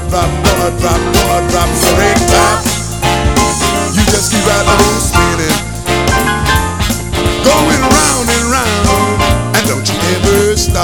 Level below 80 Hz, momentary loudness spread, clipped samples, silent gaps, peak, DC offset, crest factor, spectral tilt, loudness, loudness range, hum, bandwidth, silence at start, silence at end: -20 dBFS; 5 LU; 0.5%; none; 0 dBFS; 2%; 10 dB; -4 dB/octave; -11 LUFS; 1 LU; none; over 20 kHz; 0 s; 0 s